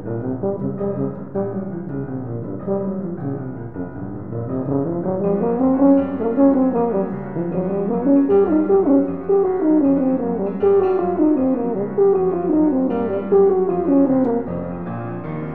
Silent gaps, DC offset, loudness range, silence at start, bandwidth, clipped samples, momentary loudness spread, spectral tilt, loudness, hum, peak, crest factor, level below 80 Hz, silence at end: none; 0.9%; 8 LU; 0 s; 3.2 kHz; under 0.1%; 12 LU; -13 dB/octave; -19 LUFS; none; -4 dBFS; 16 dB; -52 dBFS; 0 s